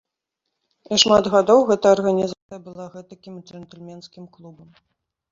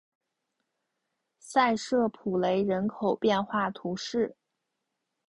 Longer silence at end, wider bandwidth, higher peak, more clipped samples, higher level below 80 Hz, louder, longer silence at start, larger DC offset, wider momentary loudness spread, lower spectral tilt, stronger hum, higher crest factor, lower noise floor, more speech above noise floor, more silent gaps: second, 0.8 s vs 0.95 s; second, 7.8 kHz vs 11.5 kHz; first, 0 dBFS vs -12 dBFS; neither; first, -58 dBFS vs -66 dBFS; first, -17 LUFS vs -28 LUFS; second, 0.9 s vs 1.45 s; neither; first, 25 LU vs 6 LU; second, -4 dB/octave vs -5.5 dB/octave; neither; about the same, 20 dB vs 18 dB; about the same, -81 dBFS vs -83 dBFS; first, 60 dB vs 56 dB; first, 2.42-2.49 s vs none